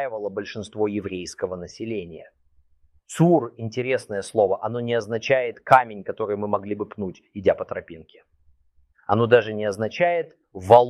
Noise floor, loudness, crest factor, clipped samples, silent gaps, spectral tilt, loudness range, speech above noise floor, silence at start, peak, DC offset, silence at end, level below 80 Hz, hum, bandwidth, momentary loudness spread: -60 dBFS; -23 LUFS; 22 dB; under 0.1%; none; -6.5 dB/octave; 6 LU; 38 dB; 0 s; 0 dBFS; under 0.1%; 0 s; -62 dBFS; none; 12.5 kHz; 16 LU